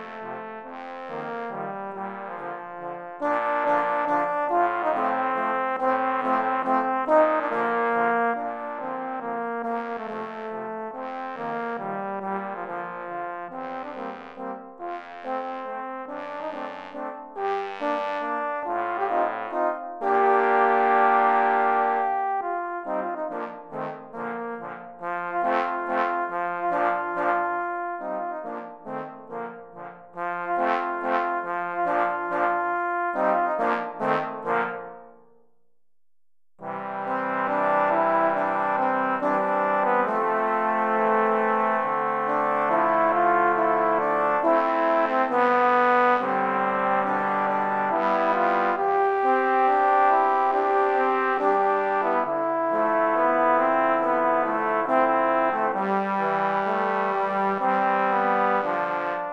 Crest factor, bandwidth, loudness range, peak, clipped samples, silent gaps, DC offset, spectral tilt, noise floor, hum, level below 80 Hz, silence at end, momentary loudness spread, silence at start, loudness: 18 dB; 7.8 kHz; 10 LU; -6 dBFS; under 0.1%; none; under 0.1%; -7 dB/octave; under -90 dBFS; none; -74 dBFS; 0 s; 14 LU; 0 s; -24 LUFS